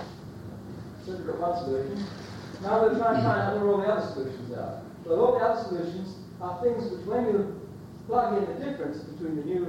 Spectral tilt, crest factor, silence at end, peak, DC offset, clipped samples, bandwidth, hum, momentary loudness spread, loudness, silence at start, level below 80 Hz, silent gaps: -7.5 dB/octave; 18 dB; 0 s; -12 dBFS; under 0.1%; under 0.1%; 16 kHz; none; 17 LU; -28 LUFS; 0 s; -58 dBFS; none